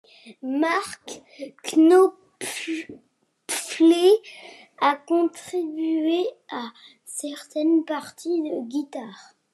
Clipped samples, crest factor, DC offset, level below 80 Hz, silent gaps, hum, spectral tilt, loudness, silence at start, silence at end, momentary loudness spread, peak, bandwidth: under 0.1%; 16 dB; under 0.1%; -84 dBFS; none; none; -2.5 dB/octave; -23 LUFS; 0.25 s; 0.3 s; 21 LU; -8 dBFS; 13 kHz